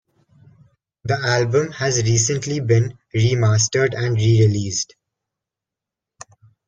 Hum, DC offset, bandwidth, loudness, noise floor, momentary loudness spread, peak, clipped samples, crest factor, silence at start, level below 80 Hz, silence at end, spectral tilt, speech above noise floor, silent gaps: none; under 0.1%; 9 kHz; -18 LUFS; -86 dBFS; 8 LU; -4 dBFS; under 0.1%; 16 dB; 1.05 s; -50 dBFS; 1.85 s; -4.5 dB/octave; 69 dB; none